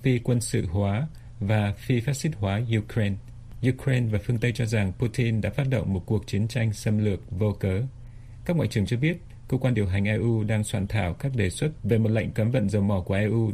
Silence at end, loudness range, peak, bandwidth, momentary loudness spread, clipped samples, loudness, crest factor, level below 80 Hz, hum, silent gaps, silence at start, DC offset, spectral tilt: 0 s; 2 LU; -10 dBFS; 14.5 kHz; 5 LU; under 0.1%; -26 LUFS; 16 dB; -46 dBFS; none; none; 0 s; under 0.1%; -7 dB/octave